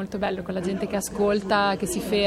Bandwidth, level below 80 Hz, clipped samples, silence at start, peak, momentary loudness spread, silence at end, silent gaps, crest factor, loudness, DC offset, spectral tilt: 16 kHz; -48 dBFS; under 0.1%; 0 s; -8 dBFS; 6 LU; 0 s; none; 16 dB; -25 LUFS; under 0.1%; -4.5 dB/octave